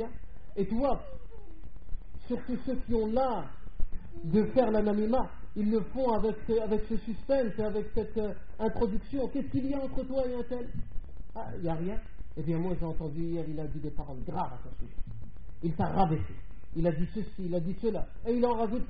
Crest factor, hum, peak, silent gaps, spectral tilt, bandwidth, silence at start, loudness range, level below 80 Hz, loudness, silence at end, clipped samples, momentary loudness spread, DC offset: 18 dB; none; -14 dBFS; none; -8 dB/octave; 5 kHz; 0 s; 6 LU; -40 dBFS; -32 LUFS; 0 s; under 0.1%; 18 LU; 2%